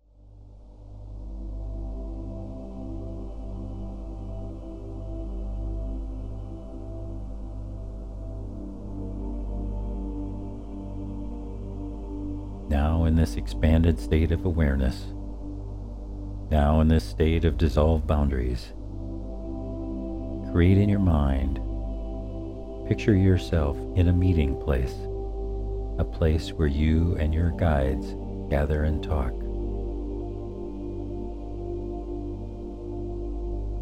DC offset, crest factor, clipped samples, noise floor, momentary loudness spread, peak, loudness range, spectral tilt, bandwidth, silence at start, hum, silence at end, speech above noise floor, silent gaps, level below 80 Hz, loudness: under 0.1%; 20 dB; under 0.1%; -49 dBFS; 15 LU; -8 dBFS; 12 LU; -8.5 dB/octave; 10 kHz; 0.2 s; none; 0 s; 27 dB; none; -30 dBFS; -28 LUFS